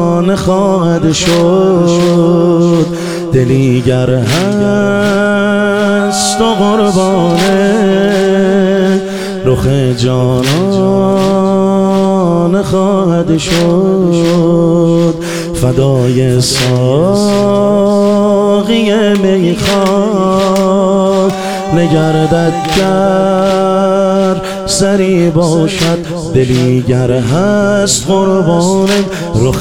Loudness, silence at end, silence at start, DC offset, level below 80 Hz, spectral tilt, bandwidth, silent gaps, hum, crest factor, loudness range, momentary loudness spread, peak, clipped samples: -10 LUFS; 0 s; 0 s; 2%; -36 dBFS; -6 dB/octave; 17 kHz; none; none; 10 dB; 1 LU; 3 LU; 0 dBFS; under 0.1%